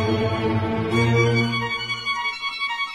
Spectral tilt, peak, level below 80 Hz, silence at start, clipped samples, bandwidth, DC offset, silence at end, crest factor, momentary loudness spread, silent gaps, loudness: -6 dB/octave; -8 dBFS; -48 dBFS; 0 s; under 0.1%; 11.5 kHz; under 0.1%; 0 s; 16 dB; 6 LU; none; -22 LUFS